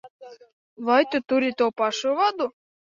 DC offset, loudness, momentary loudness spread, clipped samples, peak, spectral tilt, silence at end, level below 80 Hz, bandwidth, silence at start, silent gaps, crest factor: under 0.1%; -23 LUFS; 10 LU; under 0.1%; -6 dBFS; -3 dB/octave; 0.4 s; -72 dBFS; 7.6 kHz; 0.05 s; 0.10-0.19 s, 0.53-0.76 s; 18 dB